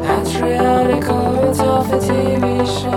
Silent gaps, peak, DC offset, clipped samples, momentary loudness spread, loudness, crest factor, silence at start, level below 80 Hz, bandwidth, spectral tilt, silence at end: none; 0 dBFS; under 0.1%; under 0.1%; 3 LU; -16 LUFS; 14 dB; 0 s; -36 dBFS; 18 kHz; -6 dB/octave; 0 s